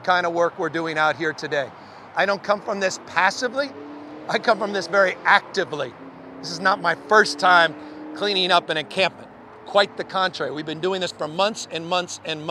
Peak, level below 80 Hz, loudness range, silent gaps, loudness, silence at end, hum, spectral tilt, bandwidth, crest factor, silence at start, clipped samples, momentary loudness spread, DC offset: -2 dBFS; -70 dBFS; 4 LU; none; -21 LUFS; 0 s; none; -3 dB/octave; 12.5 kHz; 22 dB; 0 s; under 0.1%; 13 LU; under 0.1%